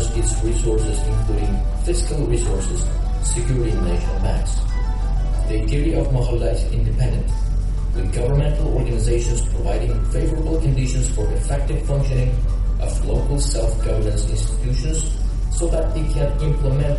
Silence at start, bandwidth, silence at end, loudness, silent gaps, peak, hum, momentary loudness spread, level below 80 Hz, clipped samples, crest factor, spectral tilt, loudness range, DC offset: 0 s; 11.5 kHz; 0 s; -22 LUFS; none; -6 dBFS; none; 3 LU; -20 dBFS; under 0.1%; 12 dB; -6 dB/octave; 1 LU; under 0.1%